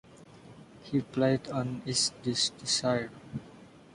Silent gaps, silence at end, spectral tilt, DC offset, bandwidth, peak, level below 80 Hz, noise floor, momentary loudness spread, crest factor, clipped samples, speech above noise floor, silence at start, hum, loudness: none; 0.15 s; -3.5 dB/octave; under 0.1%; 11.5 kHz; -14 dBFS; -64 dBFS; -52 dBFS; 15 LU; 18 dB; under 0.1%; 22 dB; 0.15 s; none; -30 LUFS